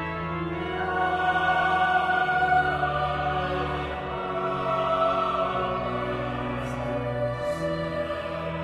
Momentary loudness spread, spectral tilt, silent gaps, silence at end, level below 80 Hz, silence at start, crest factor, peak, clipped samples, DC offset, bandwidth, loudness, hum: 8 LU; -6.5 dB/octave; none; 0 s; -44 dBFS; 0 s; 16 dB; -12 dBFS; under 0.1%; under 0.1%; 11.5 kHz; -26 LUFS; none